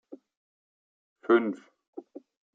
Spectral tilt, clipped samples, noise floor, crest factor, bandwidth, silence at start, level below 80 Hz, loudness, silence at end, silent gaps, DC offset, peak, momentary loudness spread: -7.5 dB/octave; under 0.1%; under -90 dBFS; 22 dB; 4.1 kHz; 0.1 s; -90 dBFS; -26 LUFS; 0.55 s; 0.37-1.16 s, 1.88-1.93 s; under 0.1%; -10 dBFS; 23 LU